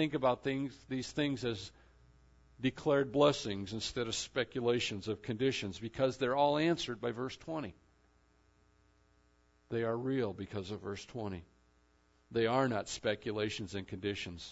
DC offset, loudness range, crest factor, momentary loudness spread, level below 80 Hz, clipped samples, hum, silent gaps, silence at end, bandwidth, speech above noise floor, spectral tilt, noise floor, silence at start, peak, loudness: under 0.1%; 7 LU; 22 dB; 12 LU; -64 dBFS; under 0.1%; none; none; 0 s; 7.6 kHz; 35 dB; -4 dB/octave; -70 dBFS; 0 s; -14 dBFS; -35 LUFS